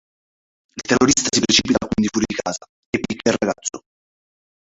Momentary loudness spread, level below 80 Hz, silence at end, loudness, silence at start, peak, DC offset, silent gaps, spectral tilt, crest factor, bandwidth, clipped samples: 16 LU; -46 dBFS; 0.9 s; -19 LUFS; 0.75 s; -2 dBFS; under 0.1%; 2.69-2.93 s; -3 dB/octave; 20 dB; 8.2 kHz; under 0.1%